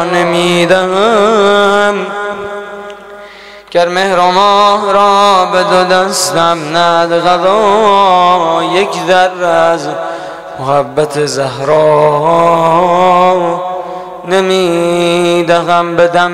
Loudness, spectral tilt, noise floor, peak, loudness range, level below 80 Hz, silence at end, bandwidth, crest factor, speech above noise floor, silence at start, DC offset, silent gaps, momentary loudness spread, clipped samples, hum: -9 LUFS; -4 dB/octave; -32 dBFS; 0 dBFS; 3 LU; -48 dBFS; 0 s; 15.5 kHz; 10 dB; 23 dB; 0 s; 0.9%; none; 12 LU; 0.1%; none